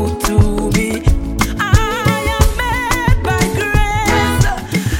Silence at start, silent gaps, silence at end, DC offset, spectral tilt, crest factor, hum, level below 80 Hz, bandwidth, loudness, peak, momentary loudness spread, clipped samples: 0 s; none; 0 s; under 0.1%; -5 dB/octave; 14 dB; none; -20 dBFS; 17 kHz; -15 LUFS; 0 dBFS; 3 LU; under 0.1%